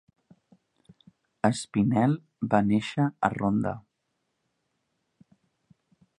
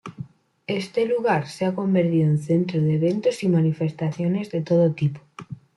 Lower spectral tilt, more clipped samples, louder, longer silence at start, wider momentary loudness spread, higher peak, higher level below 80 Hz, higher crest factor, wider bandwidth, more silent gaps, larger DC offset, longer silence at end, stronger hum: about the same, -7 dB/octave vs -8 dB/octave; neither; second, -26 LUFS vs -22 LUFS; first, 1.45 s vs 0.05 s; second, 6 LU vs 19 LU; first, -6 dBFS vs -10 dBFS; about the same, -60 dBFS vs -64 dBFS; first, 24 dB vs 12 dB; about the same, 11 kHz vs 11.5 kHz; neither; neither; first, 2.4 s vs 0.2 s; neither